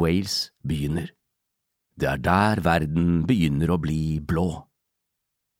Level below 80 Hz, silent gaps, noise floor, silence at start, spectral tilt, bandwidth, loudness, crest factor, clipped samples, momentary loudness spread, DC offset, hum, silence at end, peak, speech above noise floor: -40 dBFS; none; -80 dBFS; 0 s; -6.5 dB/octave; 16 kHz; -24 LUFS; 18 dB; under 0.1%; 8 LU; under 0.1%; none; 0.95 s; -8 dBFS; 58 dB